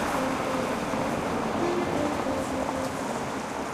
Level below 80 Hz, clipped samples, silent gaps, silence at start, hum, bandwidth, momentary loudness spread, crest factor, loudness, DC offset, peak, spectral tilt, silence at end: -50 dBFS; under 0.1%; none; 0 s; none; 15.5 kHz; 4 LU; 14 dB; -29 LUFS; under 0.1%; -14 dBFS; -5 dB/octave; 0 s